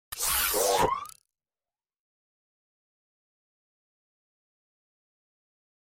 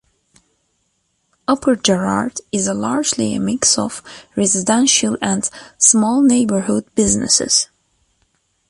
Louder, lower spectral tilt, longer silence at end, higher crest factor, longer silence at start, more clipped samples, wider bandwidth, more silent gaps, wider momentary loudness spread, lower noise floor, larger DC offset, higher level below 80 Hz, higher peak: second, -26 LUFS vs -16 LUFS; second, -1.5 dB/octave vs -3 dB/octave; first, 4.85 s vs 1.05 s; about the same, 22 dB vs 18 dB; second, 0.1 s vs 1.5 s; neither; first, 16.5 kHz vs 11.5 kHz; neither; about the same, 11 LU vs 9 LU; first, under -90 dBFS vs -67 dBFS; neither; second, -56 dBFS vs -48 dBFS; second, -12 dBFS vs 0 dBFS